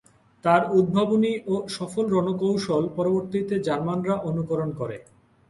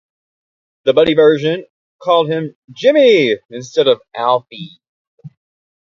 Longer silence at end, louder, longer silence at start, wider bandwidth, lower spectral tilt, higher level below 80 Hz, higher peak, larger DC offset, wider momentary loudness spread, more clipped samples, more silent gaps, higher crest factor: second, 0.5 s vs 0.65 s; second, -24 LUFS vs -14 LUFS; second, 0.45 s vs 0.85 s; first, 11.5 kHz vs 7.4 kHz; first, -7 dB/octave vs -5.5 dB/octave; about the same, -60 dBFS vs -58 dBFS; second, -4 dBFS vs 0 dBFS; neither; second, 8 LU vs 15 LU; neither; second, none vs 1.70-1.99 s, 2.55-2.68 s, 3.45-3.49 s, 4.89-5.18 s; about the same, 20 dB vs 16 dB